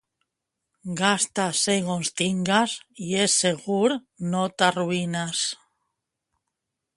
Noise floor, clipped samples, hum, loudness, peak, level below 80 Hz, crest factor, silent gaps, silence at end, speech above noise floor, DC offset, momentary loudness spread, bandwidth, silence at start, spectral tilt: -83 dBFS; under 0.1%; none; -24 LUFS; -4 dBFS; -66 dBFS; 22 dB; none; 1.4 s; 59 dB; under 0.1%; 8 LU; 11.5 kHz; 0.85 s; -3 dB/octave